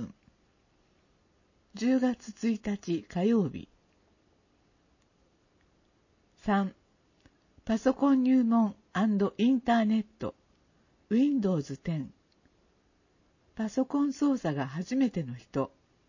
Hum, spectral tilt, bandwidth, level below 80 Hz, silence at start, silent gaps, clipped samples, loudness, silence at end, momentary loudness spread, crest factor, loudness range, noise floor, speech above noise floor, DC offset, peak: none; -7 dB/octave; 7.4 kHz; -64 dBFS; 0 s; none; under 0.1%; -29 LUFS; 0.4 s; 13 LU; 18 dB; 11 LU; -68 dBFS; 40 dB; under 0.1%; -12 dBFS